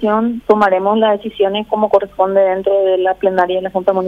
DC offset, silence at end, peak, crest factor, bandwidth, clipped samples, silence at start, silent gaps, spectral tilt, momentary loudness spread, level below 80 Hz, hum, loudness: under 0.1%; 0 s; 0 dBFS; 14 dB; 5.6 kHz; under 0.1%; 0 s; none; -7 dB/octave; 4 LU; -50 dBFS; 50 Hz at -50 dBFS; -14 LUFS